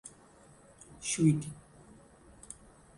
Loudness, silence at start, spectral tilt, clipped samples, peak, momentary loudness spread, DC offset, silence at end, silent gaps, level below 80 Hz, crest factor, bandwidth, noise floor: -30 LUFS; 0.05 s; -5.5 dB/octave; under 0.1%; -14 dBFS; 27 LU; under 0.1%; 0.45 s; none; -64 dBFS; 22 dB; 11.5 kHz; -59 dBFS